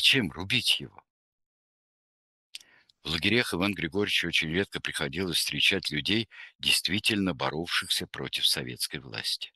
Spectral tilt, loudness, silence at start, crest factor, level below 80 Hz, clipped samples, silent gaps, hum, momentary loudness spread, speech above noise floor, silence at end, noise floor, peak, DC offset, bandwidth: -3 dB/octave; -27 LUFS; 0 s; 22 dB; -58 dBFS; under 0.1%; 1.10-1.38 s, 1.46-2.53 s, 6.55-6.59 s; none; 9 LU; 21 dB; 0.05 s; -50 dBFS; -8 dBFS; under 0.1%; 12.5 kHz